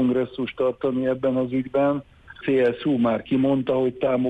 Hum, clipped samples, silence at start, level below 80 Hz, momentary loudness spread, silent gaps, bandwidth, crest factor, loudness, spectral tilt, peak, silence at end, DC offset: none; under 0.1%; 0 s; -56 dBFS; 4 LU; none; 4.7 kHz; 12 dB; -23 LUFS; -9 dB/octave; -10 dBFS; 0 s; under 0.1%